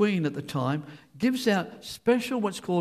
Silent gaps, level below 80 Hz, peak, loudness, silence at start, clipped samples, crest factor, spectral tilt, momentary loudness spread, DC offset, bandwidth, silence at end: none; -66 dBFS; -12 dBFS; -28 LUFS; 0 s; under 0.1%; 16 dB; -6 dB/octave; 7 LU; under 0.1%; 15 kHz; 0 s